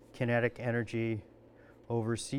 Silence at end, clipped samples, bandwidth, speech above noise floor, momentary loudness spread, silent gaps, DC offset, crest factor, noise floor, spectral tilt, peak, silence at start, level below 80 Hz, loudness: 0 s; under 0.1%; 11.5 kHz; 25 dB; 6 LU; none; under 0.1%; 20 dB; -58 dBFS; -6 dB/octave; -16 dBFS; 0.15 s; -64 dBFS; -34 LUFS